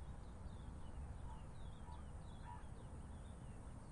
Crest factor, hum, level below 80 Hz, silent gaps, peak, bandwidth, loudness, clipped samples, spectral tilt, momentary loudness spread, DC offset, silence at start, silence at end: 12 dB; none; -56 dBFS; none; -40 dBFS; 11 kHz; -55 LUFS; under 0.1%; -6.5 dB/octave; 2 LU; under 0.1%; 0 s; 0 s